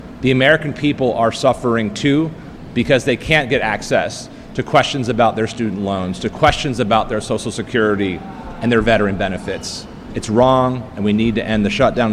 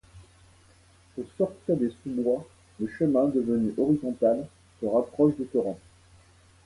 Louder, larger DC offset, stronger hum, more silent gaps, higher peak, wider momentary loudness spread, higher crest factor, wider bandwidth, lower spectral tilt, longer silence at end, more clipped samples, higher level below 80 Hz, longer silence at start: first, -17 LUFS vs -27 LUFS; neither; neither; neither; first, 0 dBFS vs -10 dBFS; about the same, 11 LU vs 13 LU; about the same, 16 dB vs 18 dB; first, 13 kHz vs 11.5 kHz; second, -5.5 dB/octave vs -9 dB/octave; second, 0 s vs 0.9 s; neither; first, -36 dBFS vs -60 dBFS; second, 0 s vs 0.15 s